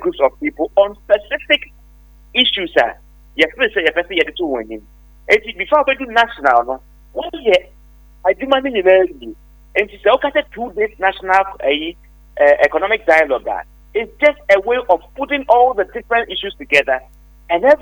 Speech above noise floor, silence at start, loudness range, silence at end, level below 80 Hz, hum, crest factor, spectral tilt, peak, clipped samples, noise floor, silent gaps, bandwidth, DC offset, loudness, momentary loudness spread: 29 dB; 0 s; 2 LU; 0.05 s; -44 dBFS; 50 Hz at -45 dBFS; 16 dB; -4 dB/octave; 0 dBFS; under 0.1%; -44 dBFS; none; over 20 kHz; under 0.1%; -16 LUFS; 12 LU